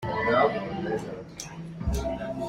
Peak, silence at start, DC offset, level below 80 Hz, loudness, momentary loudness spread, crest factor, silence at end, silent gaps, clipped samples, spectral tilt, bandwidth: -8 dBFS; 0 s; under 0.1%; -40 dBFS; -28 LUFS; 16 LU; 20 dB; 0 s; none; under 0.1%; -5.5 dB/octave; 16 kHz